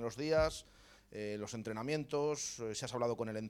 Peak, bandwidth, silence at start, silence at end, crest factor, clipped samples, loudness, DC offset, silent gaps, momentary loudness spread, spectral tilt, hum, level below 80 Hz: -20 dBFS; 16 kHz; 0 s; 0 s; 18 dB; under 0.1%; -38 LUFS; under 0.1%; none; 10 LU; -4.5 dB/octave; none; -58 dBFS